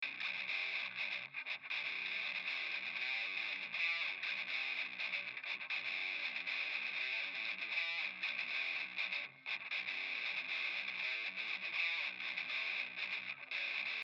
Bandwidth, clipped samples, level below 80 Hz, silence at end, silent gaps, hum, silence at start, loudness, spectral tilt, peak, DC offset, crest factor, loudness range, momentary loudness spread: 8 kHz; under 0.1%; under -90 dBFS; 0 s; none; none; 0 s; -39 LUFS; -1 dB/octave; -24 dBFS; under 0.1%; 16 dB; 1 LU; 4 LU